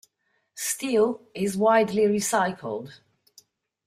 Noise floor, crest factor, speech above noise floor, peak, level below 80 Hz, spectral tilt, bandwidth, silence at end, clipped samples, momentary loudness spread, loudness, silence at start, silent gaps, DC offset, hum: -73 dBFS; 18 dB; 49 dB; -8 dBFS; -68 dBFS; -4 dB/octave; 16 kHz; 0.9 s; under 0.1%; 13 LU; -24 LUFS; 0.55 s; none; under 0.1%; none